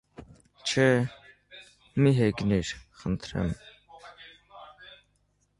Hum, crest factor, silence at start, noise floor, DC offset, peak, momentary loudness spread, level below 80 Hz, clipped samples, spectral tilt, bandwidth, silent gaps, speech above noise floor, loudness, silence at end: 50 Hz at -50 dBFS; 22 dB; 0.2 s; -70 dBFS; under 0.1%; -8 dBFS; 26 LU; -50 dBFS; under 0.1%; -6 dB/octave; 11 kHz; none; 45 dB; -27 LUFS; 0.7 s